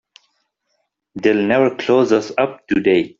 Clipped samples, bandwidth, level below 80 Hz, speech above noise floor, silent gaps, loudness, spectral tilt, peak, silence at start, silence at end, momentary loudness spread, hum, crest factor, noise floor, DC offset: under 0.1%; 7.6 kHz; -58 dBFS; 54 dB; none; -17 LUFS; -6 dB/octave; 0 dBFS; 1.15 s; 0.1 s; 6 LU; none; 16 dB; -70 dBFS; under 0.1%